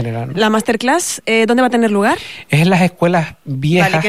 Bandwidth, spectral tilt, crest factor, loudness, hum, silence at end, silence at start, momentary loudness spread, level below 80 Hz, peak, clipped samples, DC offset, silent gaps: 15.5 kHz; -5 dB/octave; 12 dB; -14 LUFS; none; 0 s; 0 s; 7 LU; -50 dBFS; -2 dBFS; under 0.1%; 0.6%; none